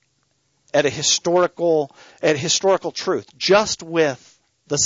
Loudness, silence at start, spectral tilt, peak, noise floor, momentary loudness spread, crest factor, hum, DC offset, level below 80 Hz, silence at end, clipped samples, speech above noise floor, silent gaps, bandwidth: -19 LUFS; 0.75 s; -2.5 dB/octave; -4 dBFS; -67 dBFS; 8 LU; 16 dB; none; under 0.1%; -60 dBFS; 0 s; under 0.1%; 48 dB; none; 8 kHz